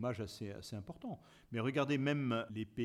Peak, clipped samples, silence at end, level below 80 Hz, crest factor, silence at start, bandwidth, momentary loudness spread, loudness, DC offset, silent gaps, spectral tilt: -22 dBFS; under 0.1%; 0 s; -68 dBFS; 18 dB; 0 s; 14 kHz; 13 LU; -39 LUFS; under 0.1%; none; -6.5 dB/octave